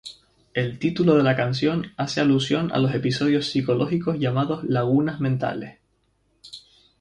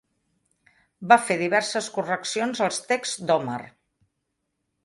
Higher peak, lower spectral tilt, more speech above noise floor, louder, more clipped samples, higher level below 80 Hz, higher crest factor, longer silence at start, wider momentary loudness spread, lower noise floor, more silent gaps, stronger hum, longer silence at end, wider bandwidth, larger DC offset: second, -6 dBFS vs -2 dBFS; first, -6.5 dB/octave vs -3 dB/octave; second, 45 dB vs 55 dB; about the same, -22 LUFS vs -23 LUFS; neither; first, -56 dBFS vs -72 dBFS; second, 18 dB vs 24 dB; second, 0.05 s vs 1 s; first, 16 LU vs 10 LU; second, -67 dBFS vs -78 dBFS; neither; neither; second, 0.4 s vs 1.15 s; about the same, 11 kHz vs 11.5 kHz; neither